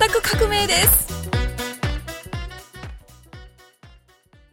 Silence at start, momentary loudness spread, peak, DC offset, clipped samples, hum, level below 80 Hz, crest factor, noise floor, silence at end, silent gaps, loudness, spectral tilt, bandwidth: 0 s; 23 LU; 0 dBFS; under 0.1%; under 0.1%; none; -32 dBFS; 22 dB; -54 dBFS; 0.65 s; none; -19 LUFS; -2.5 dB/octave; 17 kHz